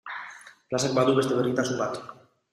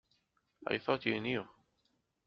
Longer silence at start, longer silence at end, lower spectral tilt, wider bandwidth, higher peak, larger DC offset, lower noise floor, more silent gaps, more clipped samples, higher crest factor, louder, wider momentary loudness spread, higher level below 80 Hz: second, 0.05 s vs 0.6 s; second, 0.4 s vs 0.8 s; first, -5 dB/octave vs -3 dB/octave; first, 14.5 kHz vs 6.4 kHz; first, -8 dBFS vs -16 dBFS; neither; second, -45 dBFS vs -79 dBFS; neither; neither; second, 18 dB vs 24 dB; first, -25 LUFS vs -36 LUFS; first, 16 LU vs 12 LU; first, -66 dBFS vs -74 dBFS